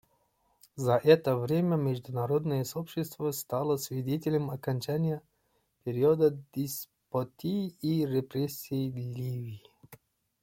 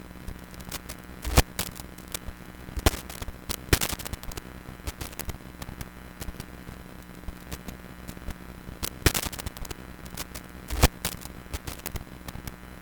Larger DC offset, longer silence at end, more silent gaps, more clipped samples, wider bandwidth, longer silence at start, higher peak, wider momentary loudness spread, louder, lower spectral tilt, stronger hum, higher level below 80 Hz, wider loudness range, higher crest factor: neither; first, 0.5 s vs 0 s; neither; neither; second, 16.5 kHz vs 19 kHz; first, 0.75 s vs 0 s; second, -8 dBFS vs -4 dBFS; second, 12 LU vs 17 LU; about the same, -31 LUFS vs -32 LUFS; first, -6.5 dB/octave vs -3.5 dB/octave; neither; second, -68 dBFS vs -36 dBFS; second, 5 LU vs 10 LU; second, 22 dB vs 28 dB